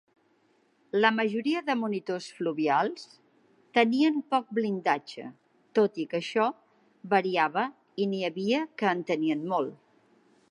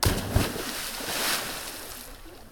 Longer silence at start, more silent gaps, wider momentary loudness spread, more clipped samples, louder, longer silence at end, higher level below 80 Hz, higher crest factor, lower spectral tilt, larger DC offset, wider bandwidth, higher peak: first, 0.95 s vs 0 s; neither; second, 8 LU vs 15 LU; neither; about the same, -28 LUFS vs -29 LUFS; first, 0.75 s vs 0 s; second, -84 dBFS vs -38 dBFS; second, 22 dB vs 30 dB; first, -5.5 dB/octave vs -3 dB/octave; neither; second, 11 kHz vs 19.5 kHz; second, -8 dBFS vs 0 dBFS